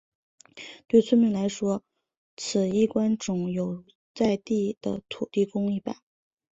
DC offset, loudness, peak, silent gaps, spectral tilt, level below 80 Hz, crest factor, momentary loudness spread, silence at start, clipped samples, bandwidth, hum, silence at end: under 0.1%; -26 LUFS; -8 dBFS; 2.17-2.37 s, 3.95-4.15 s, 4.77-4.81 s; -6 dB/octave; -64 dBFS; 20 dB; 15 LU; 0.55 s; under 0.1%; 8 kHz; none; 0.65 s